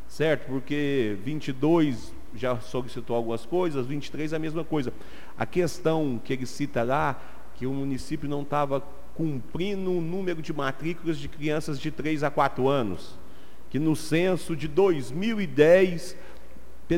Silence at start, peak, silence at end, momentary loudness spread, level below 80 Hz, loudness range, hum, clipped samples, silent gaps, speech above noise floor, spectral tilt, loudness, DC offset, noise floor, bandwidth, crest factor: 0 s; -6 dBFS; 0 s; 10 LU; -52 dBFS; 6 LU; none; under 0.1%; none; 23 dB; -6.5 dB/octave; -27 LUFS; 3%; -50 dBFS; 16 kHz; 20 dB